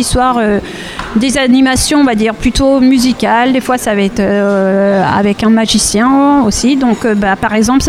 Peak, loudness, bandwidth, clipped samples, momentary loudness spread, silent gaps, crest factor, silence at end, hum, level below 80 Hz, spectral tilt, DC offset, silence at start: 0 dBFS; -10 LUFS; 15.5 kHz; under 0.1%; 4 LU; none; 10 dB; 0 s; none; -28 dBFS; -4.5 dB/octave; under 0.1%; 0 s